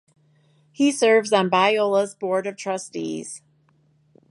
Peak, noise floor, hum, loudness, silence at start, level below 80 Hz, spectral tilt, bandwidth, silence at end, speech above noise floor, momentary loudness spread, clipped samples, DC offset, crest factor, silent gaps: -4 dBFS; -61 dBFS; none; -21 LUFS; 0.8 s; -78 dBFS; -4 dB/octave; 11.5 kHz; 0.95 s; 41 dB; 13 LU; under 0.1%; under 0.1%; 20 dB; none